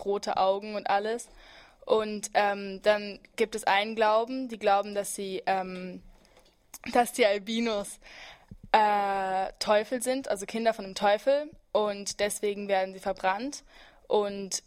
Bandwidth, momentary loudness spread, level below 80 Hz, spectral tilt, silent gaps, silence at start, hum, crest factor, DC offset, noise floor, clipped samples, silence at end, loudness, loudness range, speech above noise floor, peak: 16 kHz; 13 LU; -60 dBFS; -3 dB/octave; none; 0 s; none; 22 dB; under 0.1%; -61 dBFS; under 0.1%; 0.05 s; -28 LUFS; 3 LU; 32 dB; -6 dBFS